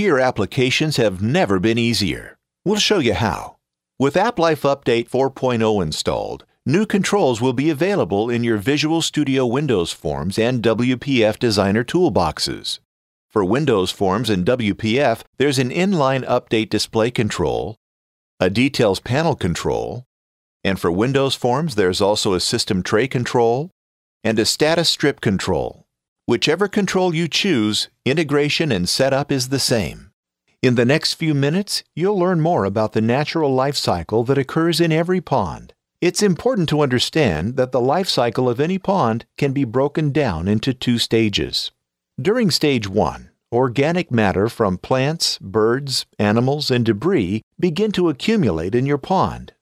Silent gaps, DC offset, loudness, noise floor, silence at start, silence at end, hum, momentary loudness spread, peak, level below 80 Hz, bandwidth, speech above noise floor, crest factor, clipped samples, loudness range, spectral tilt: 12.85-13.29 s, 15.27-15.33 s, 17.77-18.38 s, 20.06-20.60 s, 23.72-24.21 s, 26.08-26.16 s, 30.13-30.23 s, 47.43-47.51 s; under 0.1%; -19 LUFS; under -90 dBFS; 0 s; 0.15 s; none; 5 LU; -2 dBFS; -46 dBFS; 16 kHz; over 72 dB; 18 dB; under 0.1%; 1 LU; -5 dB/octave